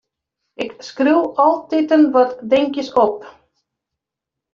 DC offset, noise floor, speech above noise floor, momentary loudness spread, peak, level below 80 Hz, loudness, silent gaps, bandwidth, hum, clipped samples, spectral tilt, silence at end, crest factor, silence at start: under 0.1%; -84 dBFS; 68 dB; 14 LU; -2 dBFS; -62 dBFS; -16 LUFS; none; 7.2 kHz; none; under 0.1%; -5 dB/octave; 1.25 s; 16 dB; 0.6 s